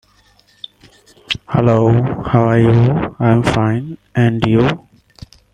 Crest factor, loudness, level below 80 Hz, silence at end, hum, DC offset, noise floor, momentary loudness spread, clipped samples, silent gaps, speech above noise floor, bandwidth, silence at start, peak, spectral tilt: 14 dB; -14 LUFS; -40 dBFS; 0.75 s; none; under 0.1%; -52 dBFS; 16 LU; under 0.1%; none; 39 dB; 9.6 kHz; 1.3 s; -2 dBFS; -8 dB/octave